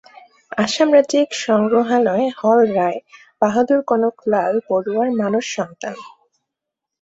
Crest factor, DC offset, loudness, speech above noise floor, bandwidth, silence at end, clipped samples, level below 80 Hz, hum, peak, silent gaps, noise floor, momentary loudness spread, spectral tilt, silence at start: 16 dB; under 0.1%; -17 LUFS; 66 dB; 8 kHz; 0.95 s; under 0.1%; -64 dBFS; none; -2 dBFS; none; -83 dBFS; 12 LU; -5 dB/octave; 0.5 s